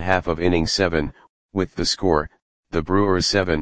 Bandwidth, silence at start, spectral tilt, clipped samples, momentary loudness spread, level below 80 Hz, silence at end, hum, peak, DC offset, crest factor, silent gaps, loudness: 10 kHz; 0 s; -4.5 dB/octave; under 0.1%; 9 LU; -38 dBFS; 0 s; none; 0 dBFS; 2%; 20 dB; 1.29-1.49 s, 2.42-2.63 s; -21 LUFS